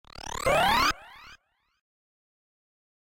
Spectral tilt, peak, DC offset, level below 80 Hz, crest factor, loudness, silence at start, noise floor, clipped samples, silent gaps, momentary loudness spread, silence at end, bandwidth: -2.5 dB/octave; -12 dBFS; under 0.1%; -48 dBFS; 20 dB; -24 LUFS; 0.2 s; -58 dBFS; under 0.1%; none; 16 LU; 1.8 s; 17 kHz